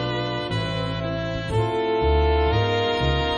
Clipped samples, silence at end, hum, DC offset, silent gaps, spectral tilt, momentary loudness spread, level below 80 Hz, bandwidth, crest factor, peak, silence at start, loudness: under 0.1%; 0 s; none; under 0.1%; none; -6.5 dB/octave; 6 LU; -30 dBFS; 9.6 kHz; 14 dB; -8 dBFS; 0 s; -23 LUFS